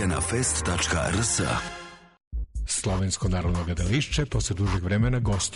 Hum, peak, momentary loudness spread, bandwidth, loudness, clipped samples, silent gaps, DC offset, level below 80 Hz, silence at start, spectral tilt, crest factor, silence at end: none; -12 dBFS; 12 LU; 11 kHz; -26 LUFS; under 0.1%; 2.27-2.31 s; under 0.1%; -34 dBFS; 0 s; -4 dB/octave; 12 dB; 0 s